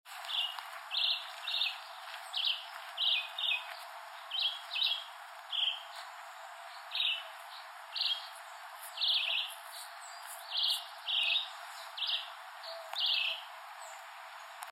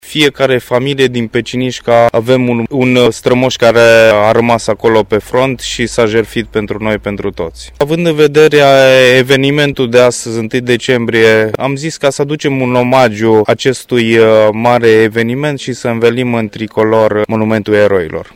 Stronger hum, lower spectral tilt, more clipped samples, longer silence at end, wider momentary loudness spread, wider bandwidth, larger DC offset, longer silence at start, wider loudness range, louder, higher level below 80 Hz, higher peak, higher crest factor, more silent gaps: neither; second, 8.5 dB/octave vs -5 dB/octave; second, under 0.1% vs 0.5%; second, 0 s vs 0.15 s; first, 17 LU vs 10 LU; about the same, 16 kHz vs 16.5 kHz; neither; about the same, 0.05 s vs 0.05 s; about the same, 3 LU vs 4 LU; second, -33 LUFS vs -10 LUFS; second, under -90 dBFS vs -40 dBFS; second, -20 dBFS vs 0 dBFS; first, 18 dB vs 10 dB; neither